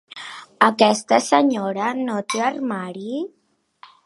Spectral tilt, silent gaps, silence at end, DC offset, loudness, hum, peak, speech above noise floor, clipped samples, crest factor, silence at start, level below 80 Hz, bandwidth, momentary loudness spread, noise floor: -4 dB/octave; none; 0.8 s; under 0.1%; -20 LUFS; none; 0 dBFS; 31 dB; under 0.1%; 22 dB; 0.15 s; -72 dBFS; 11.5 kHz; 17 LU; -51 dBFS